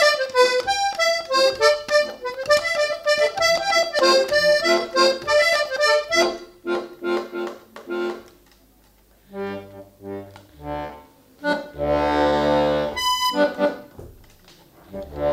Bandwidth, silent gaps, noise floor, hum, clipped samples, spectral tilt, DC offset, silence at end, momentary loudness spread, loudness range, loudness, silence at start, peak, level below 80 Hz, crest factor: 16 kHz; none; -55 dBFS; none; under 0.1%; -2.5 dB/octave; under 0.1%; 0 s; 18 LU; 15 LU; -20 LUFS; 0 s; -2 dBFS; -48 dBFS; 18 dB